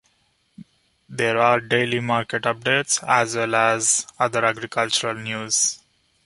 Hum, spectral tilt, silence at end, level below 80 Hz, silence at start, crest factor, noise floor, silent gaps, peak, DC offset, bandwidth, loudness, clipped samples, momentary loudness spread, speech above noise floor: none; -2 dB/octave; 0.5 s; -64 dBFS; 0.6 s; 20 dB; -65 dBFS; none; -2 dBFS; under 0.1%; 11.5 kHz; -20 LUFS; under 0.1%; 7 LU; 44 dB